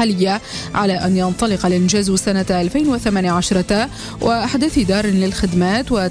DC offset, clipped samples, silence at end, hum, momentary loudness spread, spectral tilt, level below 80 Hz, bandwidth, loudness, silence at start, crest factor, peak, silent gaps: under 0.1%; under 0.1%; 0 s; none; 3 LU; -5 dB/octave; -36 dBFS; 11 kHz; -17 LUFS; 0 s; 12 dB; -4 dBFS; none